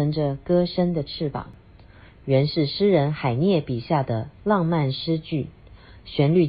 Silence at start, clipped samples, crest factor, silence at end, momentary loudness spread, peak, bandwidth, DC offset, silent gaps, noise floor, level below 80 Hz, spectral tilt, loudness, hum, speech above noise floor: 0 s; under 0.1%; 16 dB; 0 s; 9 LU; -6 dBFS; 5.2 kHz; under 0.1%; none; -48 dBFS; -50 dBFS; -11.5 dB/octave; -23 LUFS; none; 26 dB